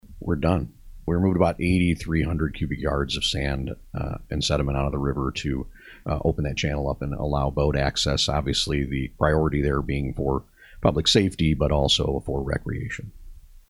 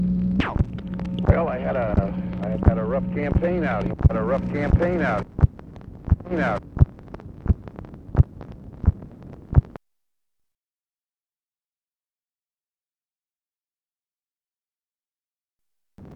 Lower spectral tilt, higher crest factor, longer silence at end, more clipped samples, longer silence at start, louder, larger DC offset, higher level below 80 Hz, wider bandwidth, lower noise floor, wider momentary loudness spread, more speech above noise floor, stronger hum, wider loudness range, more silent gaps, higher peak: second, -5.5 dB/octave vs -10 dB/octave; about the same, 20 dB vs 24 dB; about the same, 0.1 s vs 0 s; neither; about the same, 0.05 s vs 0 s; about the same, -24 LUFS vs -23 LUFS; neither; about the same, -34 dBFS vs -30 dBFS; first, 12.5 kHz vs 6 kHz; second, -43 dBFS vs under -90 dBFS; second, 10 LU vs 19 LU; second, 20 dB vs over 68 dB; neither; second, 4 LU vs 7 LU; second, none vs 11.66-11.70 s, 15.52-15.56 s; second, -4 dBFS vs 0 dBFS